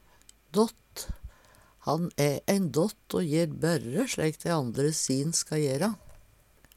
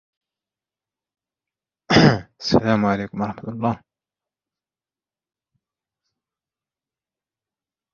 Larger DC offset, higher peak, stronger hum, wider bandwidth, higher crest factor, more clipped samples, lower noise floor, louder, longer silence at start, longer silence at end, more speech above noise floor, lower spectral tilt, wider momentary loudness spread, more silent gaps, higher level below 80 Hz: neither; second, -8 dBFS vs -2 dBFS; neither; first, 16.5 kHz vs 7.4 kHz; about the same, 22 dB vs 24 dB; neither; second, -60 dBFS vs under -90 dBFS; second, -29 LUFS vs -20 LUFS; second, 0.55 s vs 1.9 s; second, 0.6 s vs 4.2 s; second, 32 dB vs over 69 dB; about the same, -5 dB/octave vs -6 dB/octave; about the same, 12 LU vs 13 LU; neither; about the same, -52 dBFS vs -50 dBFS